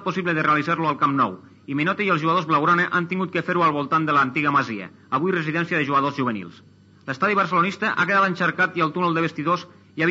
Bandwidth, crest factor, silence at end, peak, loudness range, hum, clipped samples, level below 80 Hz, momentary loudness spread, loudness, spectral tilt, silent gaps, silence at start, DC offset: 7.8 kHz; 14 dB; 0 s; -8 dBFS; 2 LU; none; under 0.1%; -74 dBFS; 8 LU; -21 LUFS; -6.5 dB/octave; none; 0 s; under 0.1%